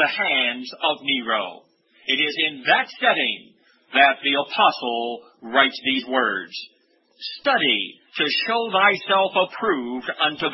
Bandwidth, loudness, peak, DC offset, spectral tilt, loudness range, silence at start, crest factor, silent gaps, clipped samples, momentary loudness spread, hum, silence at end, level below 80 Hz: 6 kHz; -20 LUFS; -2 dBFS; under 0.1%; -4.5 dB/octave; 3 LU; 0 s; 20 dB; none; under 0.1%; 12 LU; none; 0 s; -72 dBFS